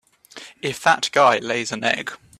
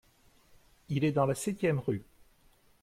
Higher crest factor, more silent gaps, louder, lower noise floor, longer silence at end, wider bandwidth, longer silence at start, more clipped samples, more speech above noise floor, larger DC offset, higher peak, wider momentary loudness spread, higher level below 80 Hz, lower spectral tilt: about the same, 18 dB vs 18 dB; neither; first, -20 LUFS vs -31 LUFS; second, -43 dBFS vs -64 dBFS; second, 0.25 s vs 0.8 s; about the same, 14.5 kHz vs 15.5 kHz; second, 0.35 s vs 0.9 s; neither; second, 23 dB vs 34 dB; neither; first, -2 dBFS vs -16 dBFS; first, 15 LU vs 8 LU; about the same, -64 dBFS vs -64 dBFS; second, -2.5 dB/octave vs -6.5 dB/octave